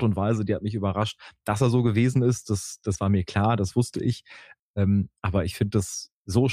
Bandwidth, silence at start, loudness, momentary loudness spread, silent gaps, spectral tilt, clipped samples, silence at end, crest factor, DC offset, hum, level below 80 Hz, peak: 15 kHz; 0 s; -25 LUFS; 9 LU; 4.59-4.74 s, 6.13-6.25 s; -6.5 dB/octave; under 0.1%; 0 s; 16 dB; under 0.1%; none; -50 dBFS; -8 dBFS